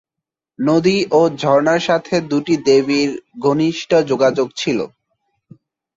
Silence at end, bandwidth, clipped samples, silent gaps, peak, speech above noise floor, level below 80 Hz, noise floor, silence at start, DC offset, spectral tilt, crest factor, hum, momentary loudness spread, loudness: 1.1 s; 7.8 kHz; under 0.1%; none; -2 dBFS; 69 dB; -58 dBFS; -84 dBFS; 0.6 s; under 0.1%; -5.5 dB/octave; 14 dB; none; 7 LU; -16 LUFS